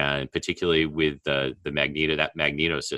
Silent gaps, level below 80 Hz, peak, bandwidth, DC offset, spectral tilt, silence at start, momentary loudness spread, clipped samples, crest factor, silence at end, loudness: none; -48 dBFS; -4 dBFS; 12 kHz; under 0.1%; -4.5 dB/octave; 0 s; 4 LU; under 0.1%; 22 dB; 0 s; -25 LUFS